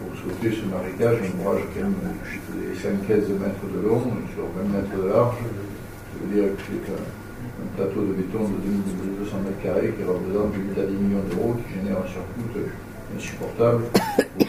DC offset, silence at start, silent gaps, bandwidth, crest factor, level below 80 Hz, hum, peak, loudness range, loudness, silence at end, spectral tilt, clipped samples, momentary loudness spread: under 0.1%; 0 s; none; 16 kHz; 24 dB; -44 dBFS; none; -2 dBFS; 3 LU; -25 LUFS; 0 s; -7 dB/octave; under 0.1%; 11 LU